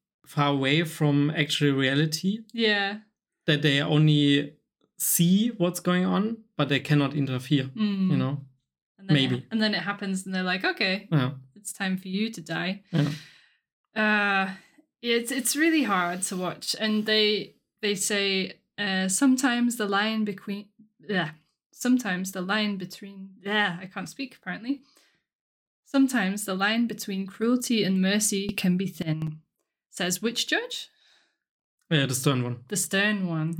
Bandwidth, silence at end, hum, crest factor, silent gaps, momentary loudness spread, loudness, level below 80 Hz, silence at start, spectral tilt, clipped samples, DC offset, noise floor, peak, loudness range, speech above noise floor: 19 kHz; 0 s; none; 20 dB; 8.82-8.95 s, 13.73-13.84 s, 21.66-21.70 s, 25.35-25.83 s, 31.49-31.78 s; 13 LU; -26 LUFS; -72 dBFS; 0.3 s; -4.5 dB/octave; under 0.1%; under 0.1%; -68 dBFS; -8 dBFS; 5 LU; 42 dB